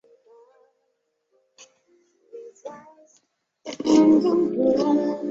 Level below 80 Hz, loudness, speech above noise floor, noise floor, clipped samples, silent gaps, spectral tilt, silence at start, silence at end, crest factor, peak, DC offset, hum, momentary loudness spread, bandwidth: -64 dBFS; -20 LUFS; 53 dB; -74 dBFS; under 0.1%; none; -6 dB/octave; 2.35 s; 0 s; 18 dB; -6 dBFS; under 0.1%; none; 25 LU; 7.8 kHz